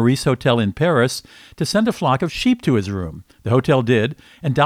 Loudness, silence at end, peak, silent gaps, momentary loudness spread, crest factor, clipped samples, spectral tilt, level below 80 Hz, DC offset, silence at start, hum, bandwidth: -19 LUFS; 0 s; -2 dBFS; none; 11 LU; 16 dB; under 0.1%; -6 dB/octave; -46 dBFS; under 0.1%; 0 s; none; 15.5 kHz